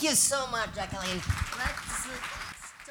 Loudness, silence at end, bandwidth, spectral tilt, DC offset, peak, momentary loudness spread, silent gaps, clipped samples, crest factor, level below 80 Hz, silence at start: -30 LUFS; 0 s; over 20 kHz; -2 dB/octave; under 0.1%; -10 dBFS; 14 LU; none; under 0.1%; 20 dB; -44 dBFS; 0 s